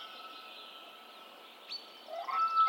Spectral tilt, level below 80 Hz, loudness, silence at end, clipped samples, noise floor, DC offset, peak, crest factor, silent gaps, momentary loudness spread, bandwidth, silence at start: -0.5 dB/octave; under -90 dBFS; -40 LUFS; 0 s; under 0.1%; -53 dBFS; under 0.1%; -20 dBFS; 18 dB; none; 18 LU; 16.5 kHz; 0 s